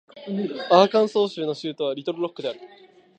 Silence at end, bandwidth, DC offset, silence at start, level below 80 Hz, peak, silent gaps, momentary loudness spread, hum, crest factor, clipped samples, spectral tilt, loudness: 0.5 s; 8.8 kHz; under 0.1%; 0.15 s; -78 dBFS; -2 dBFS; none; 15 LU; none; 22 dB; under 0.1%; -6 dB/octave; -23 LUFS